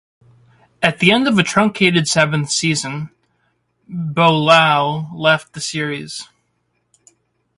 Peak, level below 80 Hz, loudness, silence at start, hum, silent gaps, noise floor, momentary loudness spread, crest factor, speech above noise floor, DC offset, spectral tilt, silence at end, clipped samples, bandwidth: 0 dBFS; -56 dBFS; -15 LUFS; 0.8 s; none; none; -67 dBFS; 16 LU; 18 dB; 51 dB; under 0.1%; -4 dB/octave; 1.35 s; under 0.1%; 11.5 kHz